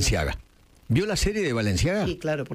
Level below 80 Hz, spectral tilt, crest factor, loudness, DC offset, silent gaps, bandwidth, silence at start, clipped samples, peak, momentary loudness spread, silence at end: -34 dBFS; -4.5 dB/octave; 16 dB; -25 LUFS; under 0.1%; none; 16 kHz; 0 s; under 0.1%; -10 dBFS; 5 LU; 0 s